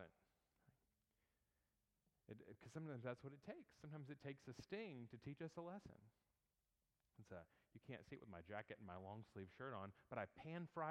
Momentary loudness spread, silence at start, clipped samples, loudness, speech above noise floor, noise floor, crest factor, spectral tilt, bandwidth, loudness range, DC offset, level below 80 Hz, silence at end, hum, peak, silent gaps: 9 LU; 0 s; under 0.1%; -56 LUFS; over 35 dB; under -90 dBFS; 24 dB; -7 dB/octave; 10 kHz; 5 LU; under 0.1%; -84 dBFS; 0 s; none; -34 dBFS; none